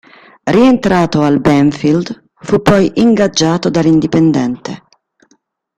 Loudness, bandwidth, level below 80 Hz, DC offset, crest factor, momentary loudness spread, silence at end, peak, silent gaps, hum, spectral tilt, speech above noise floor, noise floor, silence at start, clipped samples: -11 LUFS; 11 kHz; -42 dBFS; under 0.1%; 12 dB; 14 LU; 1 s; 0 dBFS; none; none; -6 dB/octave; 46 dB; -57 dBFS; 0.45 s; under 0.1%